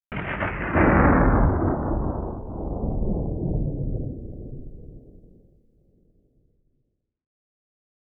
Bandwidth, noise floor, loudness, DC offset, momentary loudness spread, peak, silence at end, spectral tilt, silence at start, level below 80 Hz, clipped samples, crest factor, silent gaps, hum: 3.5 kHz; -73 dBFS; -24 LUFS; under 0.1%; 21 LU; -6 dBFS; 2.9 s; -12 dB/octave; 0.1 s; -30 dBFS; under 0.1%; 20 dB; none; none